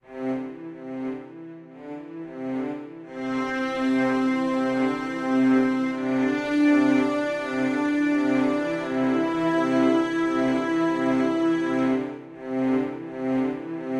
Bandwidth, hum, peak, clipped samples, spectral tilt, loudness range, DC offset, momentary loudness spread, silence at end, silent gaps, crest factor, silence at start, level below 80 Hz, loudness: 9.8 kHz; none; -10 dBFS; under 0.1%; -6 dB/octave; 7 LU; under 0.1%; 16 LU; 0 s; none; 14 dB; 0.1 s; -60 dBFS; -24 LUFS